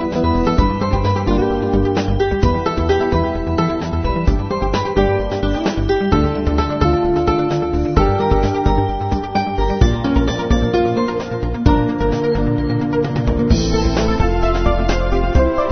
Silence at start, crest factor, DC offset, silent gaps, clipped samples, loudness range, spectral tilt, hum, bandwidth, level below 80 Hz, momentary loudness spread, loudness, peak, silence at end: 0 s; 16 dB; 0.3%; none; under 0.1%; 1 LU; -7 dB/octave; none; 6.6 kHz; -22 dBFS; 4 LU; -17 LUFS; 0 dBFS; 0 s